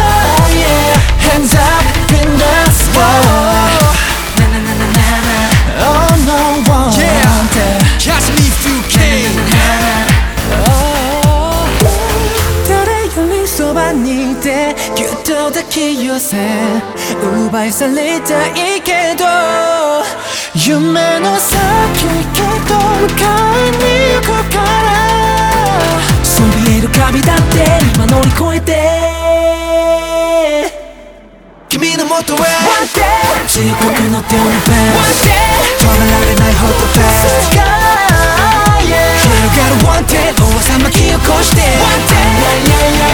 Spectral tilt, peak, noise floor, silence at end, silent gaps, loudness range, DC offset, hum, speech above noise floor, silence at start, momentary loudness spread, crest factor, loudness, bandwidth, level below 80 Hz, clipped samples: -4 dB/octave; 0 dBFS; -37 dBFS; 0 s; none; 5 LU; under 0.1%; none; 27 dB; 0 s; 5 LU; 10 dB; -10 LUFS; over 20 kHz; -18 dBFS; under 0.1%